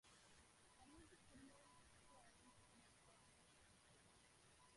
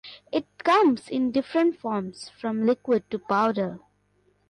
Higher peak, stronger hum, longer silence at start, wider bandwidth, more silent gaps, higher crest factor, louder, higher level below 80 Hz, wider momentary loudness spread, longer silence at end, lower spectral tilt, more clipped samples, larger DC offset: second, -54 dBFS vs -12 dBFS; second, none vs 50 Hz at -55 dBFS; about the same, 0.05 s vs 0.05 s; about the same, 11.5 kHz vs 11 kHz; neither; about the same, 16 dB vs 14 dB; second, -69 LUFS vs -25 LUFS; second, -82 dBFS vs -68 dBFS; second, 3 LU vs 11 LU; second, 0 s vs 0.7 s; second, -3 dB/octave vs -6 dB/octave; neither; neither